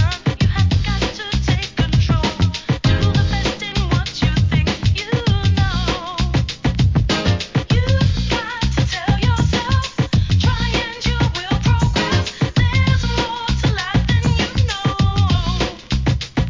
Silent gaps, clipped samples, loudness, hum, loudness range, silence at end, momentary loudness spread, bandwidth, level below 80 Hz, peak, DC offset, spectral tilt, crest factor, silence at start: none; under 0.1%; -18 LUFS; none; 1 LU; 0 s; 4 LU; 7.6 kHz; -24 dBFS; -4 dBFS; 0.2%; -5.5 dB/octave; 14 dB; 0 s